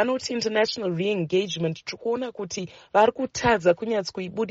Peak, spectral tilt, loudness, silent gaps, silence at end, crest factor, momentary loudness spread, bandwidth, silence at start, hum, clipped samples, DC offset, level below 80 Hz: -6 dBFS; -3.5 dB/octave; -25 LUFS; none; 0 s; 18 dB; 10 LU; 8 kHz; 0 s; none; under 0.1%; under 0.1%; -56 dBFS